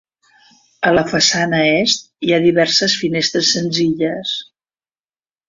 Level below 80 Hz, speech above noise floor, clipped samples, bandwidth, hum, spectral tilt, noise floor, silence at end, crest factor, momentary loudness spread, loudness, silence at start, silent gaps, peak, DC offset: -54 dBFS; over 74 dB; under 0.1%; 7.6 kHz; none; -3.5 dB/octave; under -90 dBFS; 1.05 s; 16 dB; 6 LU; -15 LUFS; 0.8 s; none; 0 dBFS; under 0.1%